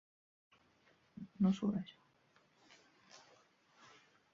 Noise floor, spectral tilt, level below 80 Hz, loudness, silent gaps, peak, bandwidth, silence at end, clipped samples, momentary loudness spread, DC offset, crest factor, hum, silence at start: -73 dBFS; -8 dB/octave; -78 dBFS; -37 LUFS; none; -22 dBFS; 7.4 kHz; 1.15 s; under 0.1%; 27 LU; under 0.1%; 22 dB; none; 1.2 s